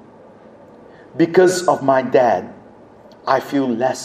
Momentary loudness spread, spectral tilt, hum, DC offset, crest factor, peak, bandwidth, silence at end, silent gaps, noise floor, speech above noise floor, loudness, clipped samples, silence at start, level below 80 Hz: 14 LU; -5 dB/octave; none; under 0.1%; 18 dB; 0 dBFS; 15.5 kHz; 0 s; none; -44 dBFS; 28 dB; -16 LUFS; under 0.1%; 1.15 s; -64 dBFS